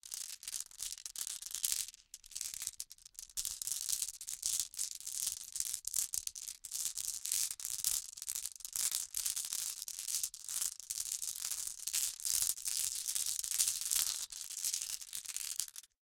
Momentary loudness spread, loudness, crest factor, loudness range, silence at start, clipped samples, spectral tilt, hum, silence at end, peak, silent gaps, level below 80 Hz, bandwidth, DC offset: 10 LU; -37 LUFS; 30 dB; 5 LU; 0.05 s; under 0.1%; 3.5 dB/octave; none; 0.25 s; -10 dBFS; none; -70 dBFS; 17 kHz; under 0.1%